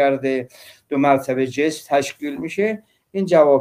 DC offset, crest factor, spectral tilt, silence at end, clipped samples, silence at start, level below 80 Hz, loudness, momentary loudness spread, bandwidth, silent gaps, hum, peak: under 0.1%; 16 dB; -5.5 dB/octave; 0 s; under 0.1%; 0 s; -66 dBFS; -20 LUFS; 11 LU; 16 kHz; none; none; -2 dBFS